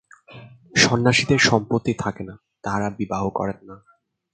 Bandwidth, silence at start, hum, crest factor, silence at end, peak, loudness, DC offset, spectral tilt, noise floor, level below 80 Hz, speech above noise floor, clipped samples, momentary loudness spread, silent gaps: 9.4 kHz; 0.3 s; none; 22 dB; 0.6 s; -2 dBFS; -20 LUFS; under 0.1%; -4 dB/octave; -44 dBFS; -50 dBFS; 23 dB; under 0.1%; 17 LU; none